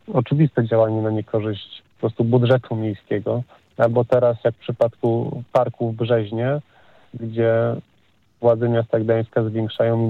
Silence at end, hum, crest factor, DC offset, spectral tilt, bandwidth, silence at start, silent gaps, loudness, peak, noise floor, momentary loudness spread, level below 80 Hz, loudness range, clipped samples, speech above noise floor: 0 s; none; 18 dB; under 0.1%; -9.5 dB/octave; 4.6 kHz; 0.1 s; none; -21 LUFS; -2 dBFS; -61 dBFS; 10 LU; -62 dBFS; 2 LU; under 0.1%; 42 dB